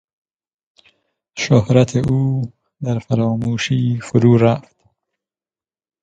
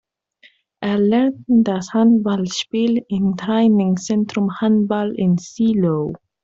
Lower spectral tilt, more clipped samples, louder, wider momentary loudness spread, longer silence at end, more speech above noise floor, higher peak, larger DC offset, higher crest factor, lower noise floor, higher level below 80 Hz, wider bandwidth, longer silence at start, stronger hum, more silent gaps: about the same, -7 dB/octave vs -6.5 dB/octave; neither; about the same, -17 LUFS vs -18 LUFS; first, 12 LU vs 6 LU; first, 1.45 s vs 0.25 s; first, over 75 dB vs 37 dB; first, 0 dBFS vs -6 dBFS; neither; first, 18 dB vs 12 dB; first, under -90 dBFS vs -54 dBFS; first, -48 dBFS vs -56 dBFS; first, 8.8 kHz vs 7.8 kHz; first, 1.35 s vs 0.8 s; neither; neither